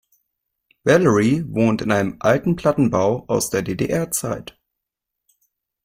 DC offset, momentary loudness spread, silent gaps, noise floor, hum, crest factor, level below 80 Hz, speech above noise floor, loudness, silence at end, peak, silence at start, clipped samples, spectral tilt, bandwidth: under 0.1%; 7 LU; none; -83 dBFS; none; 18 dB; -50 dBFS; 64 dB; -19 LUFS; 1.4 s; -2 dBFS; 0.85 s; under 0.1%; -5.5 dB/octave; 16.5 kHz